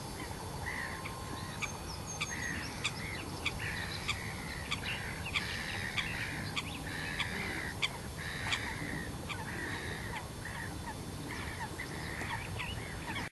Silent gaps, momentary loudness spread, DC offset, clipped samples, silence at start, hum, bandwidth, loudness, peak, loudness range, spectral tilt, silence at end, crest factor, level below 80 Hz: none; 6 LU; under 0.1%; under 0.1%; 0 s; none; 13 kHz; -38 LUFS; -18 dBFS; 4 LU; -3.5 dB/octave; 0 s; 22 dB; -50 dBFS